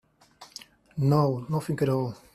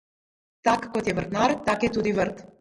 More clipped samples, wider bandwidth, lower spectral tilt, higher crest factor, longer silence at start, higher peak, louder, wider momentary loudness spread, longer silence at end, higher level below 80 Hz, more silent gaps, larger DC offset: neither; first, 13.5 kHz vs 11.5 kHz; first, -8 dB/octave vs -5.5 dB/octave; about the same, 18 dB vs 20 dB; second, 0.4 s vs 0.65 s; second, -10 dBFS vs -6 dBFS; about the same, -26 LUFS vs -25 LUFS; first, 21 LU vs 4 LU; about the same, 0.2 s vs 0.15 s; second, -62 dBFS vs -52 dBFS; neither; neither